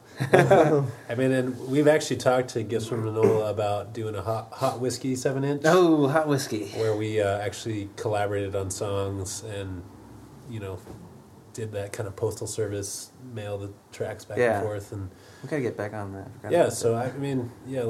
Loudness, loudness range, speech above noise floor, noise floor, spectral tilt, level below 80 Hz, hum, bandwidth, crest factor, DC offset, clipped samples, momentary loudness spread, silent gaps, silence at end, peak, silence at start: -26 LUFS; 10 LU; 23 dB; -48 dBFS; -5.5 dB/octave; -62 dBFS; none; 16 kHz; 26 dB; under 0.1%; under 0.1%; 17 LU; none; 0 s; 0 dBFS; 0.1 s